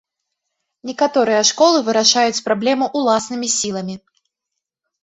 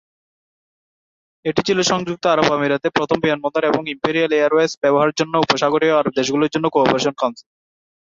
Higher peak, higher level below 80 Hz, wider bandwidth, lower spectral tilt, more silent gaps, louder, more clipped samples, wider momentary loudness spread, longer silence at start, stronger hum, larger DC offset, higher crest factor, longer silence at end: about the same, 0 dBFS vs 0 dBFS; second, -64 dBFS vs -58 dBFS; about the same, 8.4 kHz vs 7.8 kHz; second, -2 dB/octave vs -4.5 dB/octave; second, none vs 4.77-4.82 s; about the same, -16 LUFS vs -18 LUFS; neither; first, 16 LU vs 5 LU; second, 0.85 s vs 1.45 s; neither; neither; about the same, 18 dB vs 18 dB; first, 1.05 s vs 0.8 s